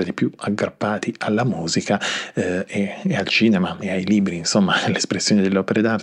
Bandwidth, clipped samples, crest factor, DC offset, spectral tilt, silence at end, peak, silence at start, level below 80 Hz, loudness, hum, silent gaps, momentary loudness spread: 11 kHz; under 0.1%; 16 dB; under 0.1%; -4.5 dB/octave; 0 s; -4 dBFS; 0 s; -60 dBFS; -20 LUFS; none; none; 6 LU